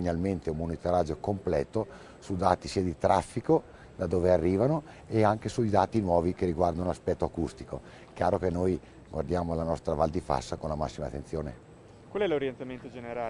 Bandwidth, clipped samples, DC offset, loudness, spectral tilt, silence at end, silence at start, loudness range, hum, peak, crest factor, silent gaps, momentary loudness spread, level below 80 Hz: 11 kHz; under 0.1%; under 0.1%; -30 LUFS; -7 dB/octave; 0 s; 0 s; 5 LU; none; -6 dBFS; 22 dB; none; 13 LU; -50 dBFS